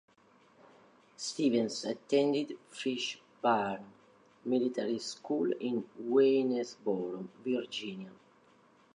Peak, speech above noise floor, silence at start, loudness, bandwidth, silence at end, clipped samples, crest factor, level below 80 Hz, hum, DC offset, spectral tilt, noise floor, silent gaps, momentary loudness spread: -16 dBFS; 32 dB; 1.2 s; -33 LUFS; 11 kHz; 0.8 s; under 0.1%; 18 dB; -82 dBFS; none; under 0.1%; -4.5 dB/octave; -64 dBFS; none; 12 LU